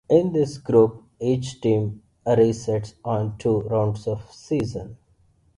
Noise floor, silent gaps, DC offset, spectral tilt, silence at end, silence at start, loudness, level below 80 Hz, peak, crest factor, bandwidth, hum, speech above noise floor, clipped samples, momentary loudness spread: -60 dBFS; none; under 0.1%; -8 dB/octave; 0.65 s; 0.1 s; -23 LUFS; -52 dBFS; -4 dBFS; 18 dB; 11 kHz; none; 38 dB; under 0.1%; 12 LU